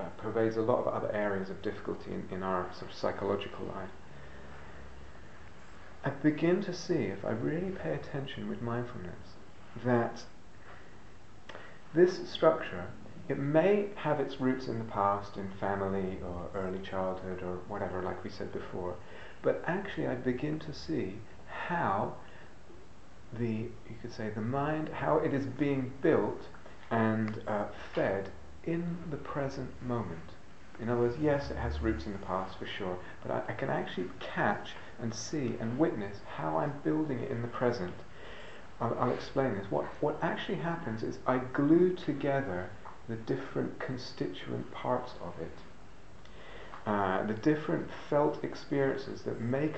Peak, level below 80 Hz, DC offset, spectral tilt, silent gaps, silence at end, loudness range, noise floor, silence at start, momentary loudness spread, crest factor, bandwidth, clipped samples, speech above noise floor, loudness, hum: -10 dBFS; -56 dBFS; 0.6%; -7 dB/octave; none; 0 s; 6 LU; -55 dBFS; 0 s; 19 LU; 22 dB; 8.4 kHz; under 0.1%; 22 dB; -34 LUFS; none